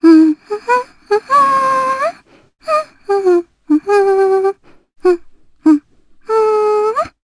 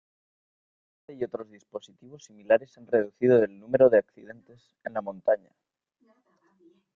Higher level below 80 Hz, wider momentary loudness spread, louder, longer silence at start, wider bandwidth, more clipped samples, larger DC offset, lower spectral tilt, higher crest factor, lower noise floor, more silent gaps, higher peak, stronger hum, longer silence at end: first, -56 dBFS vs -70 dBFS; second, 8 LU vs 21 LU; first, -14 LUFS vs -25 LUFS; second, 0 s vs 1.1 s; first, 11 kHz vs 7.2 kHz; neither; neither; second, -5 dB/octave vs -7.5 dB/octave; second, 14 dB vs 20 dB; second, -45 dBFS vs -68 dBFS; neither; first, 0 dBFS vs -8 dBFS; neither; second, 0.15 s vs 1.6 s